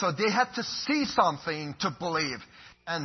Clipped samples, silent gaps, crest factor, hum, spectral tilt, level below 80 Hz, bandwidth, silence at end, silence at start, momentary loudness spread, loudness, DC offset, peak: under 0.1%; none; 20 dB; none; -4 dB/octave; -64 dBFS; 6.4 kHz; 0 s; 0 s; 9 LU; -28 LUFS; under 0.1%; -10 dBFS